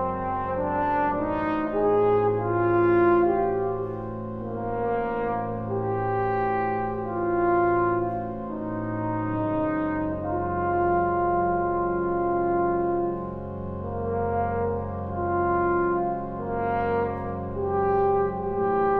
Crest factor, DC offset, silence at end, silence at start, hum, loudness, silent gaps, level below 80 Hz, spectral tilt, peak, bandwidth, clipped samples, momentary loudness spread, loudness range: 14 dB; under 0.1%; 0 s; 0 s; none; -25 LUFS; none; -46 dBFS; -11 dB/octave; -10 dBFS; 4.3 kHz; under 0.1%; 9 LU; 4 LU